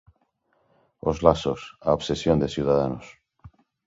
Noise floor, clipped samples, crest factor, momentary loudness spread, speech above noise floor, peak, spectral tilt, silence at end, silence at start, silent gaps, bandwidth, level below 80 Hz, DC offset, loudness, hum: -69 dBFS; under 0.1%; 24 dB; 9 LU; 46 dB; -2 dBFS; -6.5 dB/octave; 0.4 s; 1.05 s; none; 7.8 kHz; -44 dBFS; under 0.1%; -24 LUFS; none